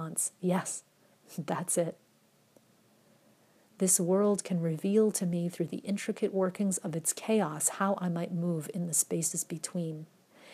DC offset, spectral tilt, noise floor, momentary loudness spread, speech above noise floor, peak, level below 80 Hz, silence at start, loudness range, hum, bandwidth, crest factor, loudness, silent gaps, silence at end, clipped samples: under 0.1%; -5 dB/octave; -67 dBFS; 9 LU; 36 dB; -14 dBFS; -84 dBFS; 0 s; 6 LU; none; 15.5 kHz; 20 dB; -31 LUFS; none; 0 s; under 0.1%